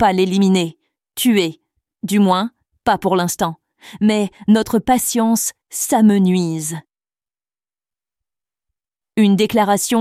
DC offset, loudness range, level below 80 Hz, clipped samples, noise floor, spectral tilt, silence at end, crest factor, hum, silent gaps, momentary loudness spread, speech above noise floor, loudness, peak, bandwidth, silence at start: under 0.1%; 5 LU; -52 dBFS; under 0.1%; under -90 dBFS; -5 dB/octave; 0 s; 14 dB; none; none; 10 LU; over 75 dB; -17 LUFS; -4 dBFS; 16 kHz; 0 s